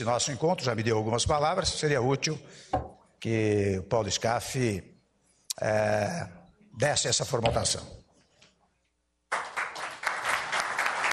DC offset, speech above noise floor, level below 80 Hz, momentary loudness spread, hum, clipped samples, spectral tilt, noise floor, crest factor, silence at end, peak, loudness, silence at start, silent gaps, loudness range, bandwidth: under 0.1%; 48 dB; -52 dBFS; 9 LU; none; under 0.1%; -3.5 dB/octave; -76 dBFS; 20 dB; 0 s; -8 dBFS; -28 LUFS; 0 s; none; 4 LU; 13 kHz